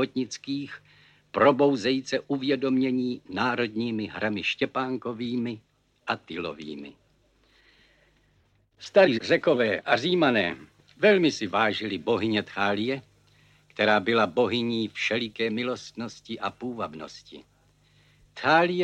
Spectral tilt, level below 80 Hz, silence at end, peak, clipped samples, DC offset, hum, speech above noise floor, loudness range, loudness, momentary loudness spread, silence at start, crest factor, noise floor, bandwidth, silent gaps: -5 dB/octave; -68 dBFS; 0 s; -6 dBFS; under 0.1%; under 0.1%; 50 Hz at -65 dBFS; 40 dB; 10 LU; -26 LUFS; 17 LU; 0 s; 20 dB; -65 dBFS; 9.2 kHz; none